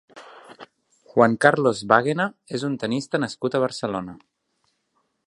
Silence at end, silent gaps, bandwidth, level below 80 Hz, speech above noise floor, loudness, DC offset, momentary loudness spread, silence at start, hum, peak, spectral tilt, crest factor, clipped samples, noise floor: 1.1 s; none; 11.5 kHz; -64 dBFS; 50 dB; -22 LUFS; under 0.1%; 11 LU; 0.15 s; none; 0 dBFS; -5.5 dB/octave; 24 dB; under 0.1%; -71 dBFS